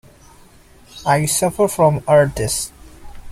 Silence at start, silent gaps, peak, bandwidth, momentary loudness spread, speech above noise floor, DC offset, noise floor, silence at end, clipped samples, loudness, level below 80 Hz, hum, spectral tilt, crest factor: 0.95 s; none; -2 dBFS; 16 kHz; 9 LU; 30 dB; under 0.1%; -46 dBFS; 0 s; under 0.1%; -17 LUFS; -42 dBFS; none; -4.5 dB/octave; 18 dB